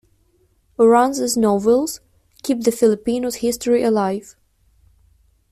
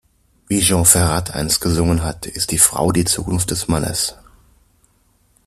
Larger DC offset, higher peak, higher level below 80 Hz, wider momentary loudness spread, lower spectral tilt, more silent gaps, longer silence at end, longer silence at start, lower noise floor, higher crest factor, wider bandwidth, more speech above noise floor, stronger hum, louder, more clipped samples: neither; second, -4 dBFS vs 0 dBFS; second, -54 dBFS vs -36 dBFS; first, 14 LU vs 10 LU; about the same, -4.5 dB/octave vs -3.5 dB/octave; neither; about the same, 1.3 s vs 1.3 s; first, 0.8 s vs 0.5 s; about the same, -60 dBFS vs -59 dBFS; about the same, 16 dB vs 18 dB; about the same, 15 kHz vs 15 kHz; about the same, 43 dB vs 42 dB; neither; about the same, -18 LUFS vs -16 LUFS; neither